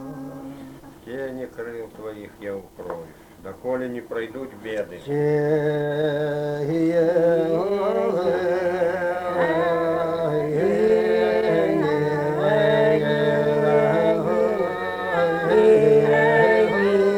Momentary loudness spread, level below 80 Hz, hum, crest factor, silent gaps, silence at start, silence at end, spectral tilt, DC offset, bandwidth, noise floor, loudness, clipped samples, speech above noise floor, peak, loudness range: 18 LU; -56 dBFS; none; 16 dB; none; 0 s; 0 s; -7 dB/octave; under 0.1%; 14.5 kHz; -41 dBFS; -21 LUFS; under 0.1%; 18 dB; -4 dBFS; 14 LU